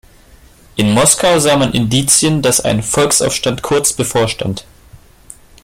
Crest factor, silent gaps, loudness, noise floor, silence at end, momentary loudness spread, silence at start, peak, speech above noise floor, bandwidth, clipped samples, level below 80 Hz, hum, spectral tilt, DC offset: 14 dB; none; -12 LUFS; -43 dBFS; 0.65 s; 8 LU; 0.75 s; 0 dBFS; 30 dB; 16.5 kHz; under 0.1%; -40 dBFS; none; -3.5 dB/octave; under 0.1%